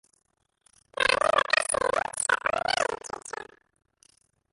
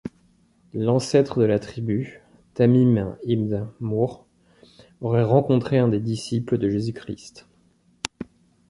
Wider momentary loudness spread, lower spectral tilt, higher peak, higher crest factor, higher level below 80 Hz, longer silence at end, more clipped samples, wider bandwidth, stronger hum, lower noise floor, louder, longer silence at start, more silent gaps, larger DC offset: about the same, 17 LU vs 17 LU; second, -0.5 dB/octave vs -7.5 dB/octave; second, -6 dBFS vs -2 dBFS; about the same, 24 dB vs 20 dB; second, -60 dBFS vs -54 dBFS; first, 1.1 s vs 0.45 s; neither; about the same, 12 kHz vs 11.5 kHz; neither; first, -67 dBFS vs -61 dBFS; second, -26 LUFS vs -22 LUFS; first, 0.95 s vs 0.05 s; neither; neither